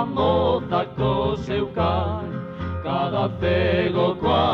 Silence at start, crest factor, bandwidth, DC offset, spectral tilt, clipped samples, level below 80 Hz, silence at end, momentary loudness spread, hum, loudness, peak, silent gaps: 0 s; 14 dB; 6.8 kHz; under 0.1%; -8 dB/octave; under 0.1%; -40 dBFS; 0 s; 9 LU; none; -23 LUFS; -8 dBFS; none